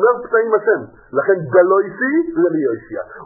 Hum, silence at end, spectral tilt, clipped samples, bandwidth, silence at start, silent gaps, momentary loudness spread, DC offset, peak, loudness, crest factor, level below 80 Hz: none; 0 s; -15.5 dB/octave; under 0.1%; 2.2 kHz; 0 s; none; 9 LU; under 0.1%; 0 dBFS; -16 LUFS; 16 dB; -58 dBFS